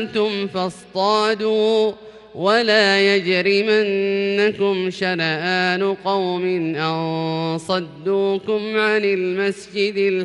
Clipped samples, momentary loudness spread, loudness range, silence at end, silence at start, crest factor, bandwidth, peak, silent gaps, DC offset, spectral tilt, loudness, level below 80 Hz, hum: under 0.1%; 7 LU; 4 LU; 0 s; 0 s; 16 dB; 11 kHz; -4 dBFS; none; under 0.1%; -5 dB/octave; -19 LUFS; -64 dBFS; none